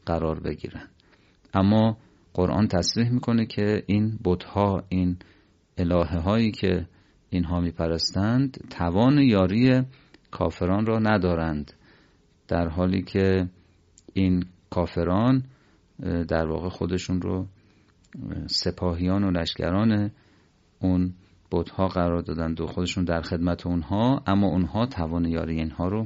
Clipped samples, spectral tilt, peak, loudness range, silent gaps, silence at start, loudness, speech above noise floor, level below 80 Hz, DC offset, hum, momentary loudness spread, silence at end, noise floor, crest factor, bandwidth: under 0.1%; -7 dB/octave; -6 dBFS; 4 LU; none; 0.05 s; -25 LUFS; 36 dB; -40 dBFS; under 0.1%; none; 10 LU; 0 s; -60 dBFS; 18 dB; 8 kHz